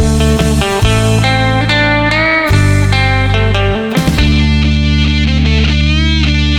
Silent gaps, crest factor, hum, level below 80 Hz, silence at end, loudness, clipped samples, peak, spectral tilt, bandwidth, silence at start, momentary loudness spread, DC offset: none; 8 dB; none; -16 dBFS; 0 s; -11 LUFS; under 0.1%; -2 dBFS; -5.5 dB/octave; 14.5 kHz; 0 s; 2 LU; under 0.1%